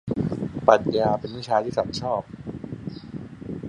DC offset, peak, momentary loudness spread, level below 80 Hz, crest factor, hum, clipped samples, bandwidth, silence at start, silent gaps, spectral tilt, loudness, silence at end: under 0.1%; -2 dBFS; 18 LU; -50 dBFS; 24 dB; none; under 0.1%; 10.5 kHz; 0.05 s; none; -6.5 dB/octave; -24 LUFS; 0 s